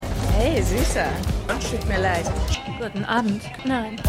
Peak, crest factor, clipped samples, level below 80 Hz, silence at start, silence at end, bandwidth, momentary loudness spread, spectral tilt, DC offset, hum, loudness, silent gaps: -6 dBFS; 16 dB; under 0.1%; -28 dBFS; 0 s; 0 s; 16 kHz; 6 LU; -5 dB/octave; under 0.1%; none; -24 LUFS; none